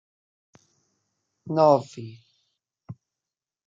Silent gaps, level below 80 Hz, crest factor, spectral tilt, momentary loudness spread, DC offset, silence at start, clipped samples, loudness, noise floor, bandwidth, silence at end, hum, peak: none; -78 dBFS; 24 dB; -7.5 dB/octave; 27 LU; under 0.1%; 1.45 s; under 0.1%; -21 LUFS; -89 dBFS; 7.6 kHz; 0.75 s; none; -6 dBFS